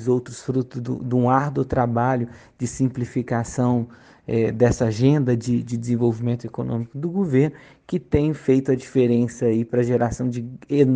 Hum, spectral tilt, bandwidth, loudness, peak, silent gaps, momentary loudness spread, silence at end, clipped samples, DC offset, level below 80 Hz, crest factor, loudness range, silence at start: none; -8 dB/octave; 9.6 kHz; -22 LUFS; -4 dBFS; none; 8 LU; 0 s; under 0.1%; under 0.1%; -46 dBFS; 18 dB; 2 LU; 0 s